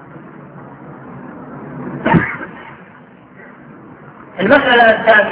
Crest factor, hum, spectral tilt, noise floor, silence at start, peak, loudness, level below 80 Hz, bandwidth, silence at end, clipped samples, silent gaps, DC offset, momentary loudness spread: 16 dB; none; -9 dB/octave; -41 dBFS; 0.15 s; 0 dBFS; -12 LUFS; -46 dBFS; 5.2 kHz; 0 s; under 0.1%; none; under 0.1%; 26 LU